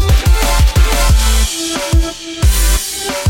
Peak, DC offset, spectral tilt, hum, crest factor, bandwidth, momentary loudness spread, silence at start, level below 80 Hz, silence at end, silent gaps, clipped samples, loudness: 0 dBFS; under 0.1%; -3.5 dB/octave; none; 10 dB; 16.5 kHz; 4 LU; 0 s; -12 dBFS; 0 s; none; under 0.1%; -13 LUFS